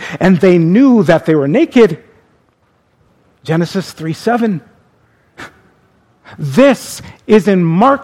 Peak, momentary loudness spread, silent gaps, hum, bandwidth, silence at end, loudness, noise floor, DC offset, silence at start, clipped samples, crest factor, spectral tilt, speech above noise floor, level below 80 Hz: 0 dBFS; 15 LU; none; none; 15.5 kHz; 0 s; -11 LUFS; -56 dBFS; under 0.1%; 0 s; 0.3%; 12 dB; -7 dB/octave; 45 dB; -48 dBFS